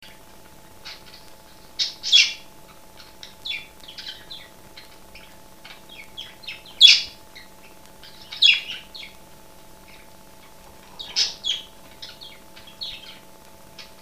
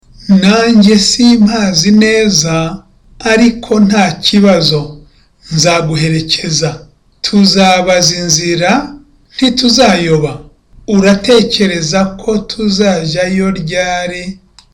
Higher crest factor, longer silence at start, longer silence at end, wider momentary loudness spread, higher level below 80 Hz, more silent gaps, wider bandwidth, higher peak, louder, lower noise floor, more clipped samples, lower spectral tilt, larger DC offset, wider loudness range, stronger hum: first, 26 dB vs 10 dB; first, 0.85 s vs 0.2 s; second, 0.2 s vs 0.4 s; first, 27 LU vs 12 LU; second, -58 dBFS vs -36 dBFS; neither; about the same, 15.5 kHz vs 17 kHz; about the same, 0 dBFS vs 0 dBFS; second, -17 LUFS vs -10 LUFS; first, -48 dBFS vs -41 dBFS; neither; second, 1.5 dB/octave vs -4 dB/octave; first, 0.4% vs under 0.1%; first, 19 LU vs 3 LU; neither